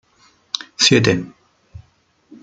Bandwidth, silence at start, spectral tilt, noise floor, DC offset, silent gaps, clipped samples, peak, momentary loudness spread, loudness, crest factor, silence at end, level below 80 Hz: 9.6 kHz; 0.55 s; -3.5 dB/octave; -59 dBFS; under 0.1%; none; under 0.1%; 0 dBFS; 15 LU; -16 LUFS; 20 dB; 0.65 s; -54 dBFS